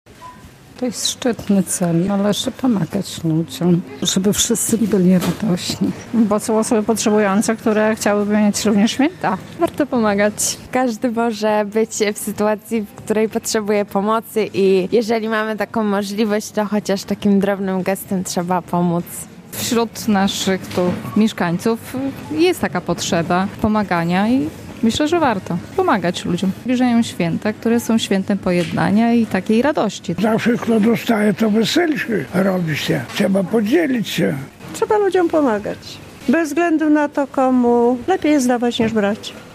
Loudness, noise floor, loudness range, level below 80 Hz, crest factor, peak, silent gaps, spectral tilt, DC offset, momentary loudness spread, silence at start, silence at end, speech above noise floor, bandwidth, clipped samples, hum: -18 LUFS; -40 dBFS; 3 LU; -52 dBFS; 14 dB; -2 dBFS; none; -5 dB/octave; under 0.1%; 6 LU; 0.2 s; 0 s; 23 dB; 15.5 kHz; under 0.1%; none